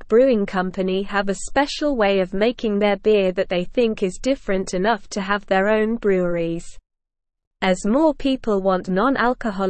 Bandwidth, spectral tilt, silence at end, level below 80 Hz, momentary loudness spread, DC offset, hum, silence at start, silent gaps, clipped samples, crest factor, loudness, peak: 8.8 kHz; -5.5 dB/octave; 0 s; -42 dBFS; 6 LU; 0.5%; none; 0 s; 7.47-7.51 s; under 0.1%; 16 dB; -20 LUFS; -4 dBFS